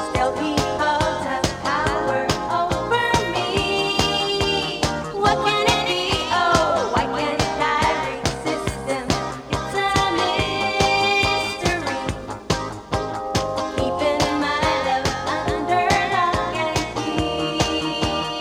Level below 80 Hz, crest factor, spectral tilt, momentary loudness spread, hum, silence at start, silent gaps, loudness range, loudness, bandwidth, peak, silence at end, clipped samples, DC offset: -38 dBFS; 22 dB; -4 dB/octave; 7 LU; none; 0 s; none; 3 LU; -21 LUFS; 18 kHz; 0 dBFS; 0 s; under 0.1%; under 0.1%